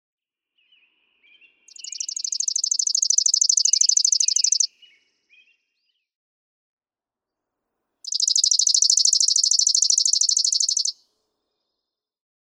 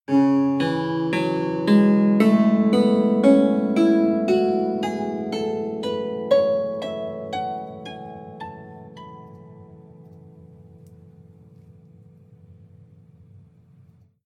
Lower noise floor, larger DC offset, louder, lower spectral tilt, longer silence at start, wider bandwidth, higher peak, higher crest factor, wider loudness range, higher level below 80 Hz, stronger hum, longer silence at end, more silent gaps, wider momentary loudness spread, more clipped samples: first, under -90 dBFS vs -54 dBFS; neither; first, -17 LUFS vs -20 LUFS; second, 9.5 dB/octave vs -7.5 dB/octave; first, 1.9 s vs 0.1 s; first, 19 kHz vs 9.8 kHz; about the same, -4 dBFS vs -4 dBFS; about the same, 18 dB vs 18 dB; second, 9 LU vs 21 LU; second, under -90 dBFS vs -68 dBFS; neither; second, 1.6 s vs 3.8 s; first, 6.15-6.77 s vs none; second, 11 LU vs 21 LU; neither